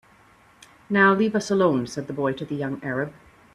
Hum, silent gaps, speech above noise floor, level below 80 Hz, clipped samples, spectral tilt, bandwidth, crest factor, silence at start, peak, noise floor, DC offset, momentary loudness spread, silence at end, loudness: none; none; 32 dB; -62 dBFS; under 0.1%; -6 dB/octave; 12 kHz; 20 dB; 0.9 s; -6 dBFS; -55 dBFS; under 0.1%; 11 LU; 0.45 s; -23 LUFS